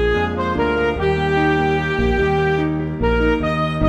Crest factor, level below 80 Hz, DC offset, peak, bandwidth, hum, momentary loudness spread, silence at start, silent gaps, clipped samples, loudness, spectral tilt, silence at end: 12 dB; -28 dBFS; 0.1%; -4 dBFS; 9.2 kHz; none; 3 LU; 0 s; none; under 0.1%; -18 LUFS; -7.5 dB/octave; 0 s